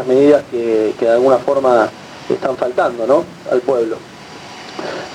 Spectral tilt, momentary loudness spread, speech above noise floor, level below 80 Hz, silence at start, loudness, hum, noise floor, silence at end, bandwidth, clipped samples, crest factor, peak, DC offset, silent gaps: -6 dB/octave; 18 LU; 20 dB; -58 dBFS; 0 s; -15 LUFS; none; -34 dBFS; 0 s; 11.5 kHz; under 0.1%; 16 dB; 0 dBFS; under 0.1%; none